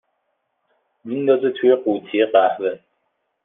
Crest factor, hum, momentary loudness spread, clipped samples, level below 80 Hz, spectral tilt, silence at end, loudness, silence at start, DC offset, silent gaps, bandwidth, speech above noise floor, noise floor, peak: 18 dB; none; 10 LU; under 0.1%; -74 dBFS; -9 dB/octave; 0.7 s; -19 LUFS; 1.05 s; under 0.1%; none; 3.8 kHz; 54 dB; -72 dBFS; -2 dBFS